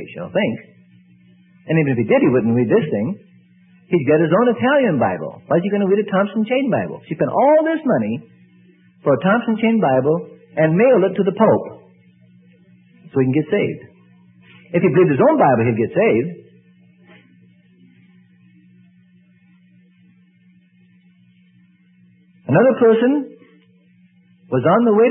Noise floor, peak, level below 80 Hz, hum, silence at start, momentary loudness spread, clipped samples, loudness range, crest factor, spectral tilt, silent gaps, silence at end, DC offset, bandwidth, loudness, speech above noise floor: -53 dBFS; 0 dBFS; -62 dBFS; none; 0 s; 11 LU; under 0.1%; 4 LU; 18 dB; -12.5 dB/octave; none; 0 s; under 0.1%; 3.7 kHz; -17 LUFS; 37 dB